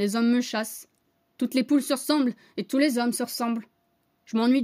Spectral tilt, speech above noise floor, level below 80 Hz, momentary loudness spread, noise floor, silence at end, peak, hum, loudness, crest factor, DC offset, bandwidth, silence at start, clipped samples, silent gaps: -4 dB/octave; 46 dB; -82 dBFS; 10 LU; -70 dBFS; 0 s; -10 dBFS; none; -26 LUFS; 16 dB; under 0.1%; 16 kHz; 0 s; under 0.1%; none